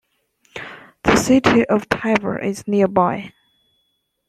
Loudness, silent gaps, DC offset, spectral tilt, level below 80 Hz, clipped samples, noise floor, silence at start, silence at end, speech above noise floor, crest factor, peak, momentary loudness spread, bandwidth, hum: -18 LUFS; none; under 0.1%; -5 dB/octave; -46 dBFS; under 0.1%; -69 dBFS; 0.55 s; 1 s; 52 dB; 20 dB; 0 dBFS; 20 LU; 14 kHz; none